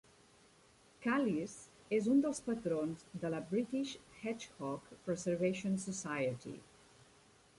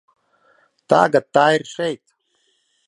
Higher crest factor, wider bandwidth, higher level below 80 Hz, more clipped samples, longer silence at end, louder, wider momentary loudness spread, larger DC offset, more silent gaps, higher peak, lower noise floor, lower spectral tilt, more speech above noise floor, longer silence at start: about the same, 16 dB vs 20 dB; about the same, 11.5 kHz vs 11 kHz; about the same, -72 dBFS vs -68 dBFS; neither; about the same, 0.95 s vs 0.9 s; second, -38 LUFS vs -17 LUFS; about the same, 12 LU vs 11 LU; neither; neither; second, -22 dBFS vs 0 dBFS; about the same, -66 dBFS vs -66 dBFS; about the same, -5.5 dB/octave vs -5 dB/octave; second, 29 dB vs 49 dB; about the same, 1 s vs 0.9 s